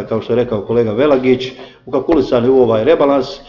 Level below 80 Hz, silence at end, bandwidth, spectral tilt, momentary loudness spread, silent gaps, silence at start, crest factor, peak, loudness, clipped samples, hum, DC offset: -42 dBFS; 0.05 s; 6 kHz; -7.5 dB/octave; 6 LU; none; 0 s; 12 dB; 0 dBFS; -14 LUFS; under 0.1%; none; under 0.1%